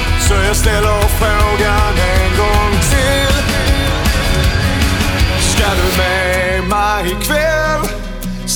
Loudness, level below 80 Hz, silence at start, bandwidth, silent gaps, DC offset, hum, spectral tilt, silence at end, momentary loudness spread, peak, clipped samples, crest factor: -13 LUFS; -18 dBFS; 0 s; over 20 kHz; none; under 0.1%; none; -4 dB/octave; 0 s; 3 LU; -2 dBFS; under 0.1%; 12 dB